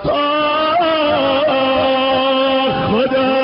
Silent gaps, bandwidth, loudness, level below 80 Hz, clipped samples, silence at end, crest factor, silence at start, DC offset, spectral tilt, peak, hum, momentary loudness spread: none; 5.6 kHz; -14 LUFS; -44 dBFS; under 0.1%; 0 s; 10 dB; 0 s; under 0.1%; -2 dB/octave; -6 dBFS; none; 2 LU